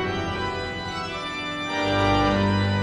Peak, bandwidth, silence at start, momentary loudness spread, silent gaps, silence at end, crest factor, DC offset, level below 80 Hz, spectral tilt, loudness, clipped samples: -10 dBFS; 10 kHz; 0 s; 9 LU; none; 0 s; 14 dB; under 0.1%; -42 dBFS; -6 dB/octave; -24 LUFS; under 0.1%